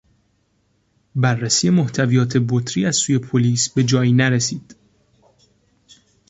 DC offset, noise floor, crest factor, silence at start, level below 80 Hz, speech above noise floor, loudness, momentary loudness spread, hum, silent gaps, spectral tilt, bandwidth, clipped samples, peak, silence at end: under 0.1%; -64 dBFS; 16 dB; 1.15 s; -56 dBFS; 47 dB; -18 LUFS; 5 LU; none; none; -4.5 dB/octave; 8.2 kHz; under 0.1%; -2 dBFS; 1.55 s